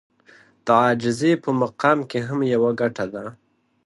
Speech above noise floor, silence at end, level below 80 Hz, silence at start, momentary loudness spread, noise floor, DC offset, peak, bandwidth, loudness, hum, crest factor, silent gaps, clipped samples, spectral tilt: 33 dB; 0.55 s; -64 dBFS; 0.65 s; 12 LU; -53 dBFS; under 0.1%; -2 dBFS; 11.5 kHz; -21 LUFS; none; 20 dB; none; under 0.1%; -6.5 dB/octave